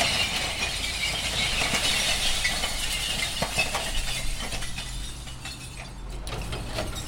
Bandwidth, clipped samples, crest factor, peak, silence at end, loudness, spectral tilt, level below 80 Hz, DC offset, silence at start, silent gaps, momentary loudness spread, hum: 16.5 kHz; under 0.1%; 20 dB; -8 dBFS; 0 s; -26 LUFS; -1.5 dB/octave; -36 dBFS; under 0.1%; 0 s; none; 14 LU; none